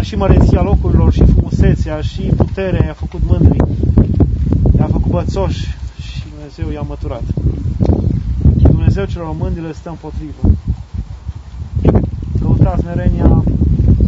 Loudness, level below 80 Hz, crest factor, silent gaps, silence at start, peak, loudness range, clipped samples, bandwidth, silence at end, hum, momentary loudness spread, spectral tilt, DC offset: -14 LUFS; -18 dBFS; 12 dB; none; 0 s; 0 dBFS; 5 LU; 0.3%; 7.6 kHz; 0 s; none; 15 LU; -9 dB/octave; under 0.1%